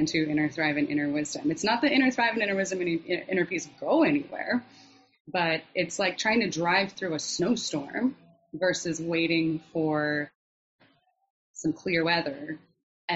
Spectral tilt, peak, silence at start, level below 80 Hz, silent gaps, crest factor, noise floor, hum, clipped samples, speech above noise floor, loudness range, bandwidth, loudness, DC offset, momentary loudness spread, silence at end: -3 dB/octave; -10 dBFS; 0 s; -66 dBFS; 5.20-5.25 s, 10.35-10.79 s, 11.30-11.54 s, 12.83-13.08 s; 18 dB; -65 dBFS; none; under 0.1%; 38 dB; 4 LU; 8 kHz; -27 LUFS; under 0.1%; 8 LU; 0 s